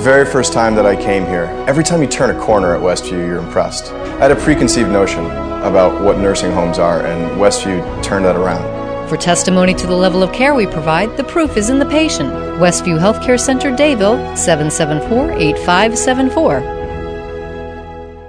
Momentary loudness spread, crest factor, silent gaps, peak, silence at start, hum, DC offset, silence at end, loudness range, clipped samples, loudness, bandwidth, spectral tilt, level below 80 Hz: 9 LU; 14 dB; none; 0 dBFS; 0 s; none; under 0.1%; 0 s; 2 LU; under 0.1%; -13 LUFS; 10 kHz; -4.5 dB/octave; -30 dBFS